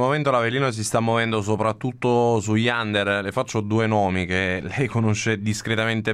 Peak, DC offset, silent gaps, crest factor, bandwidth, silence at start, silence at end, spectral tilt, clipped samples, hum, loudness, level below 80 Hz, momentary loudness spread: -6 dBFS; under 0.1%; none; 14 dB; 13 kHz; 0 s; 0 s; -5.5 dB/octave; under 0.1%; none; -22 LUFS; -54 dBFS; 4 LU